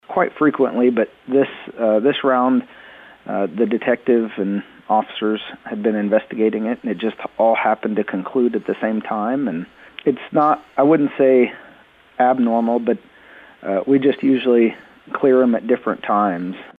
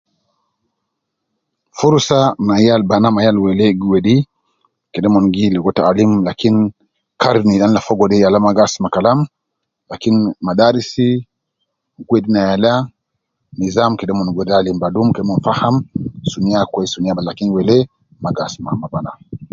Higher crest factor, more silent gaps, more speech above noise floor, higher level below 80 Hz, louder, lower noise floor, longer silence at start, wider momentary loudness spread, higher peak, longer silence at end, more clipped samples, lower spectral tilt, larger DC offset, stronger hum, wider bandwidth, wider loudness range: about the same, 14 dB vs 14 dB; neither; second, 31 dB vs 62 dB; second, -64 dBFS vs -46 dBFS; second, -19 LUFS vs -15 LUFS; second, -49 dBFS vs -75 dBFS; second, 0.1 s vs 1.75 s; about the same, 9 LU vs 11 LU; second, -4 dBFS vs 0 dBFS; about the same, 0.05 s vs 0.05 s; neither; first, -9 dB/octave vs -6.5 dB/octave; neither; neither; second, 4.1 kHz vs 7.6 kHz; about the same, 3 LU vs 4 LU